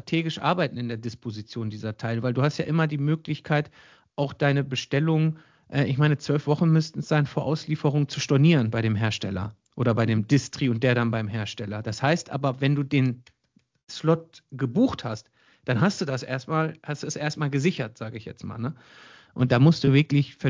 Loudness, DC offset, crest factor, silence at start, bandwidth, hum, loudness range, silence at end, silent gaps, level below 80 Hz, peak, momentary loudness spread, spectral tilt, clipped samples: -25 LUFS; under 0.1%; 18 dB; 0.05 s; 7.6 kHz; none; 4 LU; 0 s; 13.83-13.87 s; -56 dBFS; -6 dBFS; 13 LU; -6.5 dB/octave; under 0.1%